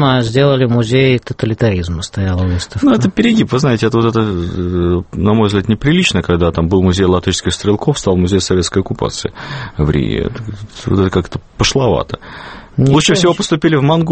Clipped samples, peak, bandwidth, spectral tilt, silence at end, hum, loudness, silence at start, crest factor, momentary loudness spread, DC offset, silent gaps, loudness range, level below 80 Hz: under 0.1%; 0 dBFS; 8.8 kHz; -5.5 dB/octave; 0 s; none; -14 LUFS; 0 s; 14 dB; 10 LU; under 0.1%; none; 3 LU; -32 dBFS